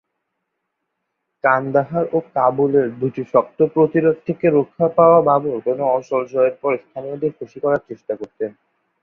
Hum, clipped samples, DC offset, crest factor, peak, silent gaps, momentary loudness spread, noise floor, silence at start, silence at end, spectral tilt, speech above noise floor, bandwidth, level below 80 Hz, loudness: none; under 0.1%; under 0.1%; 18 dB; -2 dBFS; none; 11 LU; -76 dBFS; 1.45 s; 0.5 s; -9.5 dB/octave; 58 dB; 6.4 kHz; -62 dBFS; -18 LUFS